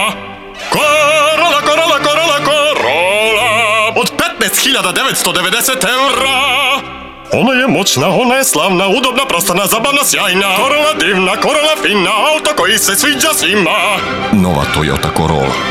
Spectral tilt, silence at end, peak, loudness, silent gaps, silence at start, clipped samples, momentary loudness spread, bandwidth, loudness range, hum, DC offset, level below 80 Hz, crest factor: -2.5 dB/octave; 0 s; -2 dBFS; -10 LUFS; none; 0 s; under 0.1%; 4 LU; 16.5 kHz; 1 LU; none; 0.2%; -38 dBFS; 10 dB